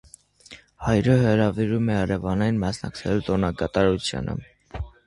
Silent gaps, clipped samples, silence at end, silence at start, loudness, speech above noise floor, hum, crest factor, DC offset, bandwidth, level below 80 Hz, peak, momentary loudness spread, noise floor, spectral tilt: none; under 0.1%; 0.15 s; 0.5 s; -23 LUFS; 27 dB; none; 18 dB; under 0.1%; 11.5 kHz; -42 dBFS; -6 dBFS; 13 LU; -49 dBFS; -7 dB/octave